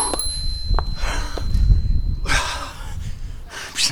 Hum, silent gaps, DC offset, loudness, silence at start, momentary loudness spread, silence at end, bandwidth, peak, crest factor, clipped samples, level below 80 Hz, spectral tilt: none; none; under 0.1%; -24 LUFS; 0 s; 13 LU; 0 s; over 20 kHz; -2 dBFS; 18 dB; under 0.1%; -22 dBFS; -3 dB/octave